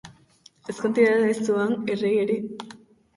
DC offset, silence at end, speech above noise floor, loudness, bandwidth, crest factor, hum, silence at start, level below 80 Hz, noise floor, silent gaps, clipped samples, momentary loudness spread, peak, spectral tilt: under 0.1%; 0.4 s; 33 dB; -23 LUFS; 11.5 kHz; 18 dB; none; 0.05 s; -68 dBFS; -56 dBFS; none; under 0.1%; 19 LU; -8 dBFS; -6 dB/octave